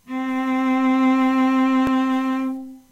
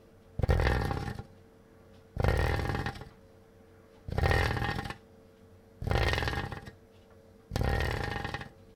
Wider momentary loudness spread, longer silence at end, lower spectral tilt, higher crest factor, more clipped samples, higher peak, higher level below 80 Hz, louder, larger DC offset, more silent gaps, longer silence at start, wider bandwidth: second, 8 LU vs 18 LU; first, 0.15 s vs 0 s; about the same, -5 dB/octave vs -6 dB/octave; second, 10 dB vs 24 dB; neither; about the same, -10 dBFS vs -10 dBFS; second, -56 dBFS vs -38 dBFS; first, -20 LUFS vs -32 LUFS; neither; neither; second, 0.1 s vs 0.4 s; second, 7.8 kHz vs 18 kHz